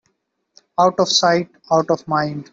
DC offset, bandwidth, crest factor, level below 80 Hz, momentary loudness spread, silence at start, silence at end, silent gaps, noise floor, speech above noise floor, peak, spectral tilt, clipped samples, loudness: under 0.1%; 7.8 kHz; 18 dB; -62 dBFS; 7 LU; 0.8 s; 0.1 s; none; -69 dBFS; 52 dB; -2 dBFS; -4 dB/octave; under 0.1%; -18 LUFS